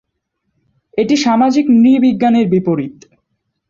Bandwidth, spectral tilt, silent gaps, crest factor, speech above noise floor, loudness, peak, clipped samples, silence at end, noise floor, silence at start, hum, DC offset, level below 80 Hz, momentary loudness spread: 7.6 kHz; -6 dB/octave; none; 12 dB; 59 dB; -12 LUFS; -2 dBFS; under 0.1%; 0.8 s; -71 dBFS; 0.95 s; none; under 0.1%; -56 dBFS; 10 LU